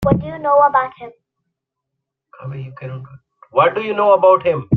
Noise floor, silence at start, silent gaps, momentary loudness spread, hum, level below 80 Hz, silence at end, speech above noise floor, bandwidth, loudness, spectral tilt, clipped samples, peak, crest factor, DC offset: -79 dBFS; 0 s; none; 19 LU; none; -44 dBFS; 0 s; 63 dB; 4.7 kHz; -15 LUFS; -9 dB/octave; under 0.1%; -2 dBFS; 16 dB; under 0.1%